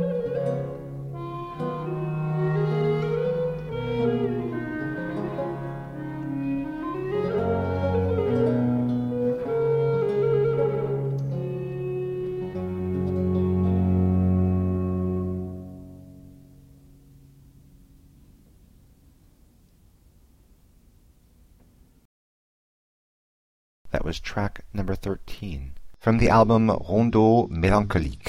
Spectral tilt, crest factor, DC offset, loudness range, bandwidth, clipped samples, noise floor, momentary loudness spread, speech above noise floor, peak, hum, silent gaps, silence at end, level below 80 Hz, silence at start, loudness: -8.5 dB/octave; 20 dB; under 0.1%; 10 LU; 11.5 kHz; under 0.1%; -57 dBFS; 13 LU; 35 dB; -6 dBFS; none; 22.05-23.85 s; 0 s; -42 dBFS; 0 s; -25 LUFS